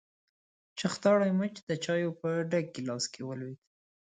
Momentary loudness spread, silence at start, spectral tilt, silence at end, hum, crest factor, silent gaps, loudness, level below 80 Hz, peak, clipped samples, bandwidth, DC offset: 15 LU; 0.75 s; -5.5 dB/octave; 0.5 s; none; 18 dB; 1.63-1.67 s; -31 LUFS; -76 dBFS; -14 dBFS; under 0.1%; 9.4 kHz; under 0.1%